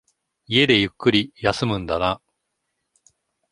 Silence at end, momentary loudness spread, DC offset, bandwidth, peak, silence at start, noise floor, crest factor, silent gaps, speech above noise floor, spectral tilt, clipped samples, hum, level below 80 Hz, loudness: 1.35 s; 8 LU; under 0.1%; 11.5 kHz; -2 dBFS; 0.5 s; -77 dBFS; 22 dB; none; 56 dB; -5.5 dB/octave; under 0.1%; none; -48 dBFS; -20 LUFS